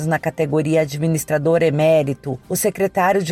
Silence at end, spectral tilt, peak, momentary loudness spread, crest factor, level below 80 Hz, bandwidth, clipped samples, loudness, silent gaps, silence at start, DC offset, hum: 0 s; -5.5 dB/octave; -6 dBFS; 6 LU; 12 dB; -52 dBFS; 16.5 kHz; under 0.1%; -18 LUFS; none; 0 s; under 0.1%; none